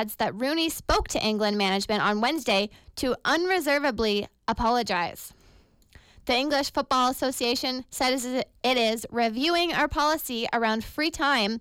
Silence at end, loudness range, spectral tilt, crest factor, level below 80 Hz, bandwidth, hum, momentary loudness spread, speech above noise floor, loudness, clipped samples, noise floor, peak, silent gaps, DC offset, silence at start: 0 s; 2 LU; -3 dB/octave; 14 dB; -46 dBFS; 17 kHz; none; 5 LU; 31 dB; -25 LUFS; under 0.1%; -57 dBFS; -12 dBFS; none; under 0.1%; 0 s